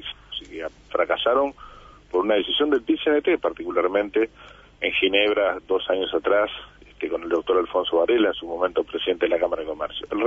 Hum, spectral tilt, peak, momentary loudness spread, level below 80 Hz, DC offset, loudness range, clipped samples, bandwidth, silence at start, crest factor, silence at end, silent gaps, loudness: 50 Hz at -55 dBFS; -5.5 dB/octave; -6 dBFS; 10 LU; -54 dBFS; under 0.1%; 1 LU; under 0.1%; 7.4 kHz; 0 s; 18 dB; 0 s; none; -23 LUFS